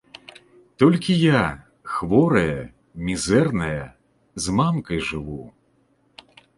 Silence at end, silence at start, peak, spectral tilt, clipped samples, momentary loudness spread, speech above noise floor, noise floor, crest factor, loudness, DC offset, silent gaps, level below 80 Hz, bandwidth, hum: 1.1 s; 0.8 s; -2 dBFS; -6 dB/octave; under 0.1%; 21 LU; 43 dB; -63 dBFS; 20 dB; -21 LUFS; under 0.1%; none; -46 dBFS; 11.5 kHz; none